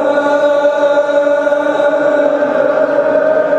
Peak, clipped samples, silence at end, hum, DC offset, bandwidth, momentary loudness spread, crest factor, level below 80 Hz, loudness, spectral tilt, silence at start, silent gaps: 0 dBFS; under 0.1%; 0 s; none; under 0.1%; 8.4 kHz; 1 LU; 10 dB; -58 dBFS; -12 LUFS; -5 dB/octave; 0 s; none